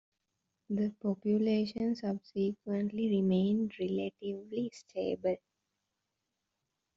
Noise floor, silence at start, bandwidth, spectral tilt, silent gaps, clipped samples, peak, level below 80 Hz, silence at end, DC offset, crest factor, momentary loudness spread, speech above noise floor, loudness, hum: -86 dBFS; 0.7 s; 7.6 kHz; -7.5 dB/octave; none; under 0.1%; -20 dBFS; -72 dBFS; 1.6 s; under 0.1%; 14 dB; 9 LU; 53 dB; -34 LUFS; none